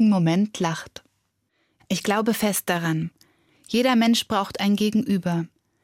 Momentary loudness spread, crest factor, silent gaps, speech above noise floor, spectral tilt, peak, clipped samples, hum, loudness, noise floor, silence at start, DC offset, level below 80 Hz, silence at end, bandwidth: 10 LU; 14 dB; none; 50 dB; -5 dB/octave; -8 dBFS; under 0.1%; none; -23 LUFS; -72 dBFS; 0 s; under 0.1%; -62 dBFS; 0.35 s; 16.5 kHz